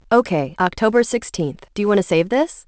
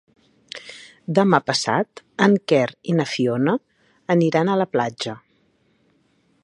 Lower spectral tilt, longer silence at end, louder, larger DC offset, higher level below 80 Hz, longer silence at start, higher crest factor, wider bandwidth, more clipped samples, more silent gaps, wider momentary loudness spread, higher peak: about the same, -5.5 dB/octave vs -5.5 dB/octave; second, 0.05 s vs 1.25 s; about the same, -19 LUFS vs -20 LUFS; first, 0.2% vs under 0.1%; first, -50 dBFS vs -66 dBFS; second, 0.1 s vs 0.55 s; about the same, 16 dB vs 20 dB; second, 8 kHz vs 11 kHz; neither; neither; second, 8 LU vs 19 LU; about the same, -2 dBFS vs -2 dBFS